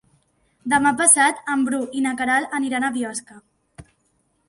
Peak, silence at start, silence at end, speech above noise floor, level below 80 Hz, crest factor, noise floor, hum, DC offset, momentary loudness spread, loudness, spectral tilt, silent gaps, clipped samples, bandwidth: 0 dBFS; 0.65 s; 0.65 s; 46 dB; -60 dBFS; 22 dB; -67 dBFS; none; under 0.1%; 14 LU; -19 LUFS; -1.5 dB/octave; none; under 0.1%; 11.5 kHz